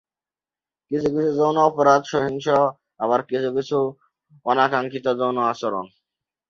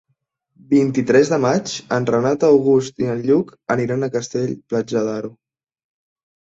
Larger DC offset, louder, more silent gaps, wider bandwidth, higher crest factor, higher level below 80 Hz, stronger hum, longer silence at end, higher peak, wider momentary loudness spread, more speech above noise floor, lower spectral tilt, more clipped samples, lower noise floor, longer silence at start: neither; second, -21 LUFS vs -18 LUFS; neither; about the same, 7.4 kHz vs 8 kHz; about the same, 20 dB vs 16 dB; about the same, -62 dBFS vs -60 dBFS; neither; second, 0.65 s vs 1.2 s; about the same, -2 dBFS vs -2 dBFS; about the same, 10 LU vs 9 LU; first, over 70 dB vs 53 dB; about the same, -6 dB/octave vs -6 dB/octave; neither; first, under -90 dBFS vs -71 dBFS; first, 0.9 s vs 0.7 s